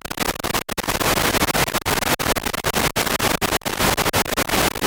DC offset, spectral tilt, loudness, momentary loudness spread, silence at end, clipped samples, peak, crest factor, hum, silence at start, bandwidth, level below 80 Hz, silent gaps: under 0.1%; -2.5 dB/octave; -20 LUFS; 5 LU; 0 s; under 0.1%; -4 dBFS; 16 dB; none; 0.05 s; 19 kHz; -36 dBFS; none